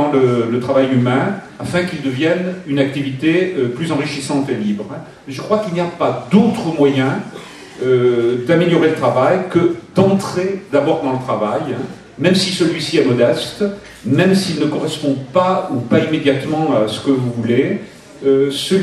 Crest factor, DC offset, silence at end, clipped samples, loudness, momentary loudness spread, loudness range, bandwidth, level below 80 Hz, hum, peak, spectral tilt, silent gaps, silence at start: 16 dB; under 0.1%; 0 s; under 0.1%; -16 LUFS; 8 LU; 3 LU; 13 kHz; -54 dBFS; none; 0 dBFS; -6 dB/octave; none; 0 s